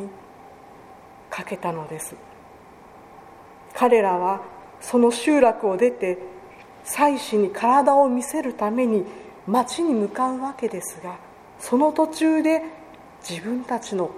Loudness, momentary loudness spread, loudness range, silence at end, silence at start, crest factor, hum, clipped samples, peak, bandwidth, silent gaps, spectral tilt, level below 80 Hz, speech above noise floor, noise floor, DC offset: -22 LUFS; 19 LU; 5 LU; 0 s; 0 s; 20 dB; none; under 0.1%; -2 dBFS; 15.5 kHz; none; -4.5 dB/octave; -62 dBFS; 25 dB; -46 dBFS; under 0.1%